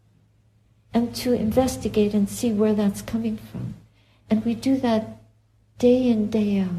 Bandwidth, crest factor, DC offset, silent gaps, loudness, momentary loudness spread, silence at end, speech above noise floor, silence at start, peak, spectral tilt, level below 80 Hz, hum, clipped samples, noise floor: 14.5 kHz; 16 dB; under 0.1%; none; -23 LUFS; 9 LU; 0 s; 38 dB; 0.95 s; -6 dBFS; -6.5 dB/octave; -48 dBFS; none; under 0.1%; -60 dBFS